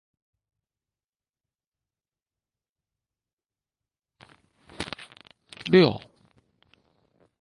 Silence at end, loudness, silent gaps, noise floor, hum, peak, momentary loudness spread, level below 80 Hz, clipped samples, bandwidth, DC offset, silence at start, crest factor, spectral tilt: 1.45 s; -23 LUFS; none; under -90 dBFS; none; -6 dBFS; 26 LU; -62 dBFS; under 0.1%; 11.5 kHz; under 0.1%; 4.8 s; 26 dB; -7 dB/octave